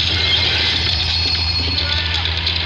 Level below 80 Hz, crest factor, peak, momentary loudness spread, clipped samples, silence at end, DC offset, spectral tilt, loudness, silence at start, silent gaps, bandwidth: -28 dBFS; 14 dB; -4 dBFS; 4 LU; under 0.1%; 0 s; under 0.1%; -3.5 dB/octave; -15 LUFS; 0 s; none; 9 kHz